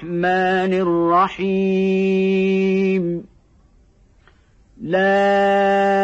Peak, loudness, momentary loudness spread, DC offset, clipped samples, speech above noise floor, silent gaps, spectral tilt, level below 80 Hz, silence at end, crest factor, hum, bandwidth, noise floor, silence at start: -6 dBFS; -17 LUFS; 6 LU; under 0.1%; under 0.1%; 36 dB; none; -7.5 dB/octave; -54 dBFS; 0 s; 12 dB; none; 8 kHz; -53 dBFS; 0 s